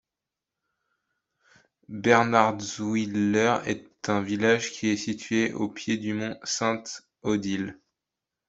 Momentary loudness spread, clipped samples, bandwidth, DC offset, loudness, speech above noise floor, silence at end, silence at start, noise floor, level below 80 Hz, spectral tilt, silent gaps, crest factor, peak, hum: 11 LU; under 0.1%; 8 kHz; under 0.1%; -26 LUFS; 62 dB; 0.75 s; 1.9 s; -88 dBFS; -66 dBFS; -4.5 dB/octave; none; 24 dB; -4 dBFS; none